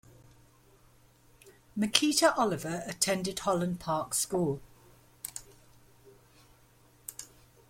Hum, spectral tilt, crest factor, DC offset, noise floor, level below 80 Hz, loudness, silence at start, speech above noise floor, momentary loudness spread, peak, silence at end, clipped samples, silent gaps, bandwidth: none; -3 dB/octave; 32 dB; under 0.1%; -62 dBFS; -64 dBFS; -30 LUFS; 1.45 s; 32 dB; 19 LU; -2 dBFS; 0.45 s; under 0.1%; none; 16.5 kHz